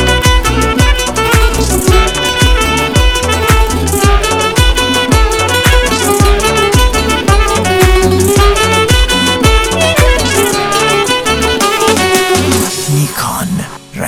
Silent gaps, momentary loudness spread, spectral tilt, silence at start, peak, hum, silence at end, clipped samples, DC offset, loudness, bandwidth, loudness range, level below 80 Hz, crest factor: none; 3 LU; -4 dB/octave; 0 s; 0 dBFS; none; 0 s; 0.9%; 0.3%; -10 LUFS; 16 kHz; 1 LU; -14 dBFS; 10 dB